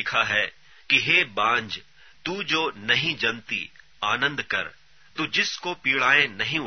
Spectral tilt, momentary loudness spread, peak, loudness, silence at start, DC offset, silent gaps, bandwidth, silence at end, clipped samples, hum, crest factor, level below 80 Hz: -2.5 dB/octave; 14 LU; -4 dBFS; -23 LUFS; 0 s; 0.2%; none; 6.6 kHz; 0 s; under 0.1%; none; 22 dB; -62 dBFS